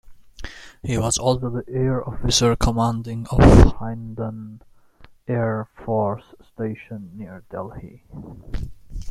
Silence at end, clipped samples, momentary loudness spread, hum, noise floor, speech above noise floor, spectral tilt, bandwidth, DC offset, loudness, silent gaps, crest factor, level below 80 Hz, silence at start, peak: 0 s; under 0.1%; 23 LU; none; -49 dBFS; 28 dB; -5.5 dB/octave; 13.5 kHz; under 0.1%; -20 LUFS; none; 20 dB; -28 dBFS; 0.05 s; -2 dBFS